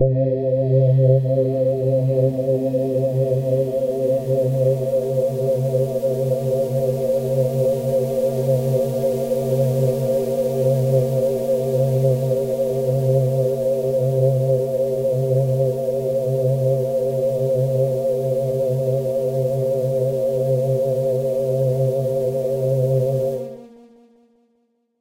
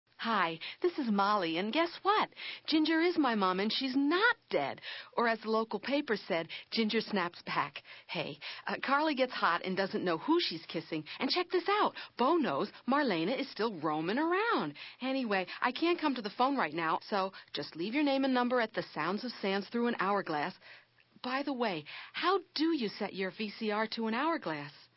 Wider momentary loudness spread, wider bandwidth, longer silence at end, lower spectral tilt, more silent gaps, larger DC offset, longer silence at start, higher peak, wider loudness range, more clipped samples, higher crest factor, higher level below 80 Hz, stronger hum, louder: second, 3 LU vs 9 LU; first, 16 kHz vs 5.8 kHz; first, 1.35 s vs 0.2 s; about the same, -9 dB/octave vs -8.5 dB/octave; neither; neither; second, 0 s vs 0.2 s; first, -4 dBFS vs -16 dBFS; second, 1 LU vs 4 LU; neither; about the same, 14 dB vs 18 dB; first, -54 dBFS vs -84 dBFS; neither; first, -20 LUFS vs -33 LUFS